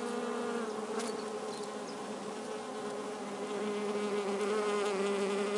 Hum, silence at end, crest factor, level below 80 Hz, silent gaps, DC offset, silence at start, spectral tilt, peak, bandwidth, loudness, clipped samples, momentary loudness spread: none; 0 s; 14 dB; -84 dBFS; none; under 0.1%; 0 s; -4 dB/octave; -22 dBFS; 11.5 kHz; -36 LUFS; under 0.1%; 8 LU